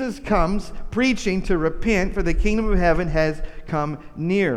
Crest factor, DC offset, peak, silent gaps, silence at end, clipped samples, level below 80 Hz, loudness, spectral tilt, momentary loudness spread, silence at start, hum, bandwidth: 16 dB; under 0.1%; -6 dBFS; none; 0 s; under 0.1%; -28 dBFS; -22 LUFS; -6.5 dB/octave; 9 LU; 0 s; none; 11 kHz